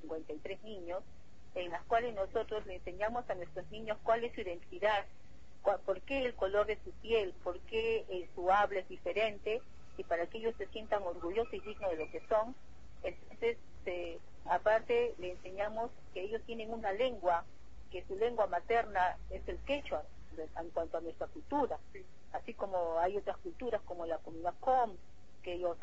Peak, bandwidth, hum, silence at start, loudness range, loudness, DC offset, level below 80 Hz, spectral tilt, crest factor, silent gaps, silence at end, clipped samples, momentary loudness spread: -18 dBFS; 7.6 kHz; none; 0 s; 4 LU; -37 LUFS; 0.5%; -58 dBFS; -2.5 dB/octave; 20 dB; none; 0.05 s; under 0.1%; 12 LU